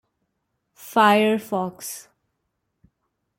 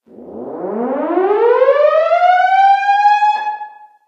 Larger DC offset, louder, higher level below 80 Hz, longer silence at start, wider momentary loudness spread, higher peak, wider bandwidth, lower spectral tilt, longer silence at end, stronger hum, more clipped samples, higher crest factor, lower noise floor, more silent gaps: neither; second, -20 LUFS vs -13 LUFS; about the same, -70 dBFS vs -72 dBFS; first, 0.8 s vs 0.2 s; about the same, 18 LU vs 16 LU; second, -4 dBFS vs 0 dBFS; first, 17 kHz vs 7.6 kHz; about the same, -4.5 dB/octave vs -4.5 dB/octave; first, 1.35 s vs 0.4 s; neither; neither; first, 22 dB vs 14 dB; first, -76 dBFS vs -33 dBFS; neither